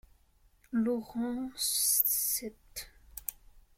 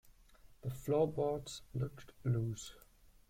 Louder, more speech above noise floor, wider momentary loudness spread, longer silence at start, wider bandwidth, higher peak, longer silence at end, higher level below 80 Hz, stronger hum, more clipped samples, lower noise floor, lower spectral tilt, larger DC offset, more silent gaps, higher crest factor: first, -30 LUFS vs -39 LUFS; first, 34 dB vs 24 dB; first, 19 LU vs 13 LU; first, 0.7 s vs 0.05 s; about the same, 16.5 kHz vs 16 kHz; first, -10 dBFS vs -22 dBFS; second, 0.2 s vs 0.5 s; about the same, -60 dBFS vs -62 dBFS; neither; neither; first, -66 dBFS vs -62 dBFS; second, -2 dB/octave vs -7 dB/octave; neither; neither; first, 24 dB vs 18 dB